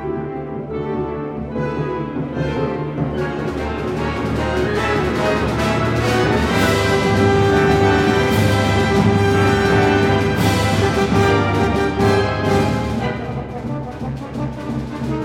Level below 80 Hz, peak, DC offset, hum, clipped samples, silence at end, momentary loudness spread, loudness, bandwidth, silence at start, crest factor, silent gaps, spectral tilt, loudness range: -32 dBFS; -2 dBFS; under 0.1%; none; under 0.1%; 0 s; 11 LU; -18 LUFS; 16.5 kHz; 0 s; 16 dB; none; -6 dB/octave; 8 LU